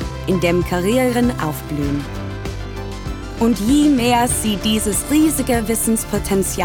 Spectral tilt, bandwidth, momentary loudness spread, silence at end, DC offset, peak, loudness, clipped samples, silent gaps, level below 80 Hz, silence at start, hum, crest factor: -4.5 dB/octave; over 20 kHz; 13 LU; 0 s; under 0.1%; -4 dBFS; -18 LUFS; under 0.1%; none; -32 dBFS; 0 s; none; 14 dB